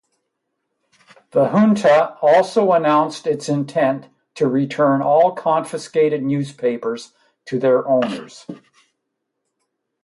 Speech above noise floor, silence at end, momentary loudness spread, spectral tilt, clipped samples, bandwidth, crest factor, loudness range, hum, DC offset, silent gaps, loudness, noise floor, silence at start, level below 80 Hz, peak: 59 dB; 1.45 s; 12 LU; -6.5 dB/octave; under 0.1%; 11.5 kHz; 16 dB; 6 LU; none; under 0.1%; none; -18 LUFS; -76 dBFS; 1.35 s; -70 dBFS; -4 dBFS